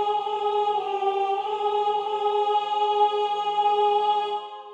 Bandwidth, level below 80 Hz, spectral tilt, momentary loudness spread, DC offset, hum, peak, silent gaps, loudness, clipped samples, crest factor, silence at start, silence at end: 8 kHz; under -90 dBFS; -3 dB/octave; 4 LU; under 0.1%; none; -10 dBFS; none; -24 LUFS; under 0.1%; 14 dB; 0 s; 0 s